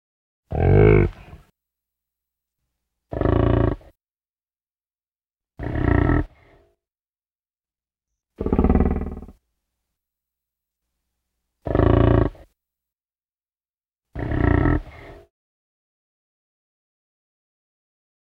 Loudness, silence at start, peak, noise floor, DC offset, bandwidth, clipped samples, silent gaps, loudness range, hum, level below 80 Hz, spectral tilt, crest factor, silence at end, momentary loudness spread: -20 LUFS; 0.5 s; -2 dBFS; under -90 dBFS; under 0.1%; 4.5 kHz; under 0.1%; 7.35-7.39 s; 5 LU; none; -32 dBFS; -10.5 dB/octave; 22 dB; 3.15 s; 19 LU